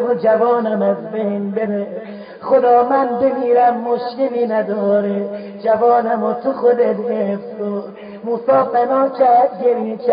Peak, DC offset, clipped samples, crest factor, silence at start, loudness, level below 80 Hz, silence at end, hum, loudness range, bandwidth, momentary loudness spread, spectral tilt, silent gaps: -2 dBFS; under 0.1%; under 0.1%; 14 dB; 0 s; -16 LUFS; -64 dBFS; 0 s; none; 2 LU; 5.2 kHz; 11 LU; -12 dB/octave; none